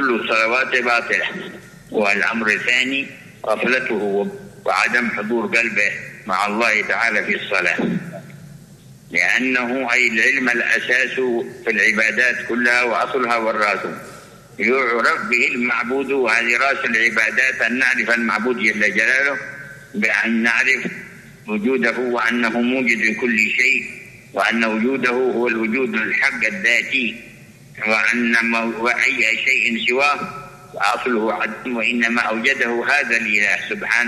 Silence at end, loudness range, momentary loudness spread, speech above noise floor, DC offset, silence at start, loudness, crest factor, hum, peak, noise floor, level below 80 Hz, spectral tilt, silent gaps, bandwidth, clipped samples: 0 s; 3 LU; 9 LU; 25 dB; under 0.1%; 0 s; -17 LUFS; 18 dB; none; -2 dBFS; -43 dBFS; -60 dBFS; -3.5 dB/octave; none; 13 kHz; under 0.1%